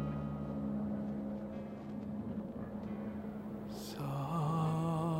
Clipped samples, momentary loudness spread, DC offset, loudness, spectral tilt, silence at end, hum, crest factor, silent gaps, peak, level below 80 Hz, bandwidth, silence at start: under 0.1%; 10 LU; under 0.1%; -40 LUFS; -8 dB/octave; 0 s; none; 14 dB; none; -24 dBFS; -58 dBFS; 16 kHz; 0 s